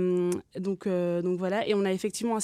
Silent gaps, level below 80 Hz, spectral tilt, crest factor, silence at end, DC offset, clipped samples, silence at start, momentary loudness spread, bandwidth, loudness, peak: none; -70 dBFS; -5.5 dB/octave; 14 dB; 0 s; under 0.1%; under 0.1%; 0 s; 5 LU; 14.5 kHz; -29 LUFS; -14 dBFS